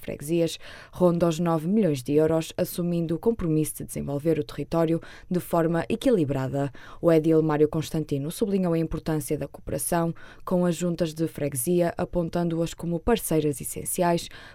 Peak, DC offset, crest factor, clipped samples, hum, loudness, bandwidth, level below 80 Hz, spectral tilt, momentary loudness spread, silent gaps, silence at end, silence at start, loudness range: -6 dBFS; under 0.1%; 18 dB; under 0.1%; none; -26 LUFS; 16.5 kHz; -46 dBFS; -6 dB/octave; 8 LU; none; 0 s; 0 s; 3 LU